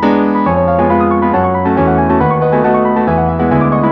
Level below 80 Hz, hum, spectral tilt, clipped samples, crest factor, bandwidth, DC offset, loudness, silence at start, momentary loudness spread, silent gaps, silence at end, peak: -32 dBFS; none; -10.5 dB/octave; under 0.1%; 10 dB; 5.6 kHz; under 0.1%; -12 LUFS; 0 s; 1 LU; none; 0 s; 0 dBFS